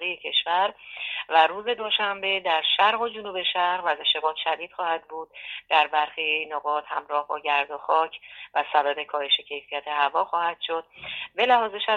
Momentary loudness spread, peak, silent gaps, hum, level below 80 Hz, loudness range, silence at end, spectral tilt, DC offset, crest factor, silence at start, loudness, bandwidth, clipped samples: 11 LU; -4 dBFS; none; none; -72 dBFS; 3 LU; 0 s; -3 dB/octave; under 0.1%; 20 dB; 0 s; -24 LUFS; 7.2 kHz; under 0.1%